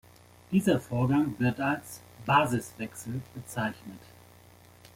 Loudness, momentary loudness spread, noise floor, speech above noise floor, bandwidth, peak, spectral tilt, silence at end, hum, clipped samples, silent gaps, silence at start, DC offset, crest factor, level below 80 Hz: -29 LUFS; 16 LU; -55 dBFS; 26 dB; 16.5 kHz; -10 dBFS; -6 dB/octave; 1 s; 60 Hz at -50 dBFS; under 0.1%; none; 0.5 s; under 0.1%; 20 dB; -60 dBFS